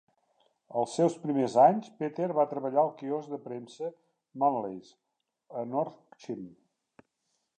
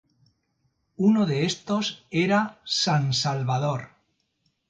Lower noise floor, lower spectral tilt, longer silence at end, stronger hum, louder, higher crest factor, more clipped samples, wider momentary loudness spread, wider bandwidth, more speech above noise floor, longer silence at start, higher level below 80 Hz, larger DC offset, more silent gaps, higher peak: first, -80 dBFS vs -73 dBFS; first, -7 dB/octave vs -5 dB/octave; first, 1.1 s vs 0.8 s; neither; second, -29 LUFS vs -24 LUFS; about the same, 22 dB vs 18 dB; neither; first, 18 LU vs 6 LU; about the same, 9.6 kHz vs 9 kHz; about the same, 50 dB vs 49 dB; second, 0.7 s vs 1 s; second, -84 dBFS vs -64 dBFS; neither; neither; about the same, -10 dBFS vs -8 dBFS